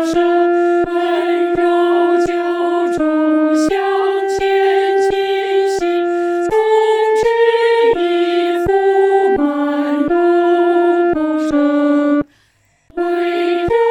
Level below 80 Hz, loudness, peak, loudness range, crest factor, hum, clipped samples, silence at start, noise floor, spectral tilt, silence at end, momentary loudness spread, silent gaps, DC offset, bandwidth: -46 dBFS; -14 LUFS; -2 dBFS; 2 LU; 12 dB; none; under 0.1%; 0 s; -56 dBFS; -5 dB/octave; 0 s; 4 LU; none; under 0.1%; 11 kHz